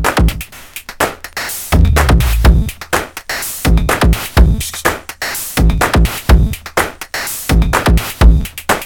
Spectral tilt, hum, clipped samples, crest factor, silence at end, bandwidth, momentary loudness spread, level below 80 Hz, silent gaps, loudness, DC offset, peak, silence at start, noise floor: -5 dB/octave; none; under 0.1%; 12 dB; 0 s; 19 kHz; 9 LU; -14 dBFS; none; -14 LUFS; under 0.1%; 0 dBFS; 0 s; -31 dBFS